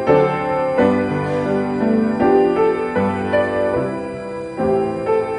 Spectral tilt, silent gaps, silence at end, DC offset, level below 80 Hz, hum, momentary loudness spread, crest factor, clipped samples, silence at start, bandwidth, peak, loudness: -8 dB/octave; none; 0 s; under 0.1%; -48 dBFS; none; 7 LU; 16 dB; under 0.1%; 0 s; 10 kHz; -2 dBFS; -18 LUFS